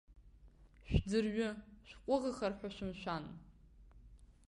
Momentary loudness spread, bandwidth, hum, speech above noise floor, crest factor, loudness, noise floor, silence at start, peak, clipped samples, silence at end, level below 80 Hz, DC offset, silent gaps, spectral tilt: 17 LU; 11 kHz; none; 24 dB; 22 dB; -39 LUFS; -62 dBFS; 0.1 s; -18 dBFS; under 0.1%; 0.15 s; -50 dBFS; under 0.1%; none; -6.5 dB/octave